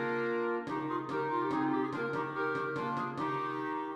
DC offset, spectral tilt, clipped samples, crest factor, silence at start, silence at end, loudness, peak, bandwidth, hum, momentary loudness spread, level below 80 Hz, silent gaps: under 0.1%; -7 dB/octave; under 0.1%; 14 dB; 0 s; 0 s; -34 LUFS; -20 dBFS; 9.6 kHz; none; 4 LU; -76 dBFS; none